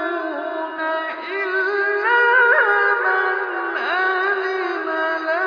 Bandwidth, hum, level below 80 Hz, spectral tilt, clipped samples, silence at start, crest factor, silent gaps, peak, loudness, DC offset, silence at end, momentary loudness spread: 5.4 kHz; none; -84 dBFS; -2.5 dB/octave; under 0.1%; 0 s; 16 dB; none; -2 dBFS; -19 LUFS; under 0.1%; 0 s; 11 LU